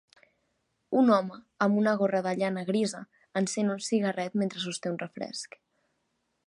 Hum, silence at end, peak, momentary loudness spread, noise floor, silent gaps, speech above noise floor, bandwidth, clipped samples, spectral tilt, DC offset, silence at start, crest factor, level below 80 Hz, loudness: none; 1 s; -10 dBFS; 13 LU; -77 dBFS; none; 49 dB; 11.5 kHz; under 0.1%; -5 dB/octave; under 0.1%; 0.9 s; 20 dB; -78 dBFS; -29 LUFS